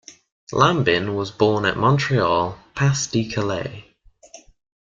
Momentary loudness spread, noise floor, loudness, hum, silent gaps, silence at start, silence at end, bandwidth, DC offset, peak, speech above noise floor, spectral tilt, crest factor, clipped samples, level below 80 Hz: 9 LU; -48 dBFS; -20 LUFS; none; 0.32-0.47 s; 0.1 s; 0.45 s; 7.6 kHz; under 0.1%; -2 dBFS; 28 dB; -5 dB/octave; 20 dB; under 0.1%; -50 dBFS